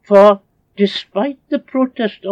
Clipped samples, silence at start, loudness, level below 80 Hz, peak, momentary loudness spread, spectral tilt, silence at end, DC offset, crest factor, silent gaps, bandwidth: 0.5%; 0.1 s; -16 LUFS; -64 dBFS; 0 dBFS; 12 LU; -7 dB/octave; 0 s; under 0.1%; 14 dB; none; 7.8 kHz